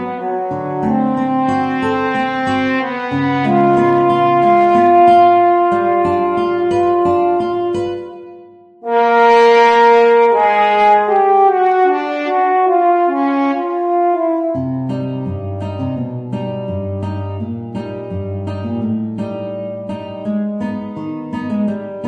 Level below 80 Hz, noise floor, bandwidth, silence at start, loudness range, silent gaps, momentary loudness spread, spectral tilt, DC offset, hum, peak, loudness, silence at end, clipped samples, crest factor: -54 dBFS; -40 dBFS; 9 kHz; 0 s; 12 LU; none; 15 LU; -7.5 dB/octave; under 0.1%; none; 0 dBFS; -14 LUFS; 0 s; under 0.1%; 14 dB